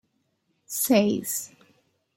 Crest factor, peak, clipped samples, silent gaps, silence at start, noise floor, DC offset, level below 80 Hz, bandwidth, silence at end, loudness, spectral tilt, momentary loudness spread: 22 dB; -6 dBFS; under 0.1%; none; 0.7 s; -73 dBFS; under 0.1%; -72 dBFS; 16.5 kHz; 0.7 s; -24 LUFS; -4 dB/octave; 13 LU